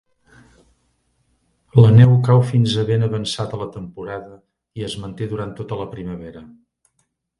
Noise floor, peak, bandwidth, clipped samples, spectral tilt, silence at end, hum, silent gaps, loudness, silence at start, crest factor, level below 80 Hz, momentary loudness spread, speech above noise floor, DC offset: -70 dBFS; 0 dBFS; 11 kHz; under 0.1%; -7.5 dB/octave; 0.95 s; none; none; -17 LUFS; 1.75 s; 18 dB; -46 dBFS; 20 LU; 53 dB; under 0.1%